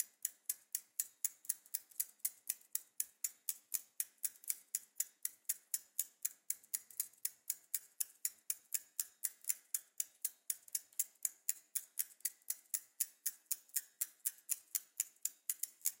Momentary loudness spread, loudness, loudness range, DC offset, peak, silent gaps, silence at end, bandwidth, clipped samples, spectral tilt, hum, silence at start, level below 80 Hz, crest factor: 4 LU; -41 LUFS; 1 LU; under 0.1%; -14 dBFS; none; 0.05 s; 17 kHz; under 0.1%; 5 dB/octave; none; 0 s; under -90 dBFS; 30 dB